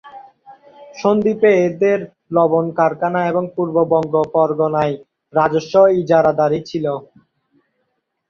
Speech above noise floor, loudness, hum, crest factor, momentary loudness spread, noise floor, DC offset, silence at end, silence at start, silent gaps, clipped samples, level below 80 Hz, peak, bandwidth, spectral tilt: 55 dB; -16 LUFS; none; 16 dB; 9 LU; -71 dBFS; under 0.1%; 1.3 s; 0.05 s; none; under 0.1%; -58 dBFS; -2 dBFS; 7 kHz; -7.5 dB/octave